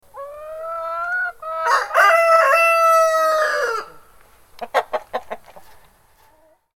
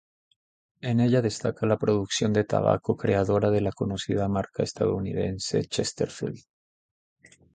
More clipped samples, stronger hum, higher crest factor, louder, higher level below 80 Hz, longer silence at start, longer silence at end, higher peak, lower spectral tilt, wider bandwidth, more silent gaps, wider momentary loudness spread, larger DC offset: neither; neither; about the same, 16 dB vs 20 dB; first, -17 LUFS vs -26 LUFS; second, -60 dBFS vs -52 dBFS; second, 0.15 s vs 0.85 s; about the same, 1.15 s vs 1.15 s; first, -2 dBFS vs -6 dBFS; second, 0 dB/octave vs -6 dB/octave; first, 17.5 kHz vs 9.4 kHz; neither; first, 20 LU vs 7 LU; neither